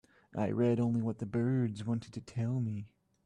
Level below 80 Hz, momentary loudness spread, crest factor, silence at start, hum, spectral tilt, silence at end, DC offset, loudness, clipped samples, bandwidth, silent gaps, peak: -68 dBFS; 13 LU; 14 dB; 0.35 s; none; -9 dB/octave; 0.4 s; under 0.1%; -34 LUFS; under 0.1%; 9.6 kHz; none; -20 dBFS